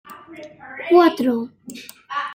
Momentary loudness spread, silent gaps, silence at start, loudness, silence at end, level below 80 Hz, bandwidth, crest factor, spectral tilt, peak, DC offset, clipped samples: 24 LU; none; 0.1 s; -18 LUFS; 0 s; -68 dBFS; 16.5 kHz; 18 dB; -5 dB/octave; -2 dBFS; under 0.1%; under 0.1%